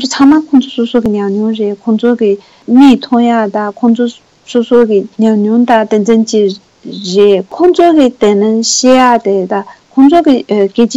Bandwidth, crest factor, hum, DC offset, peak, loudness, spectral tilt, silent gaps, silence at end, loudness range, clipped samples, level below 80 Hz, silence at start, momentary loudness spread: 8.4 kHz; 8 dB; none; under 0.1%; 0 dBFS; -9 LUFS; -5 dB/octave; none; 0 s; 2 LU; 1%; -48 dBFS; 0 s; 9 LU